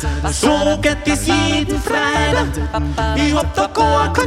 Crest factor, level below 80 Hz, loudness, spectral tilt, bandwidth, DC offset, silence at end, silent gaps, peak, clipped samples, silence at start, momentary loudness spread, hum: 16 dB; -24 dBFS; -16 LUFS; -4.5 dB/octave; 15.5 kHz; under 0.1%; 0 s; none; 0 dBFS; under 0.1%; 0 s; 5 LU; none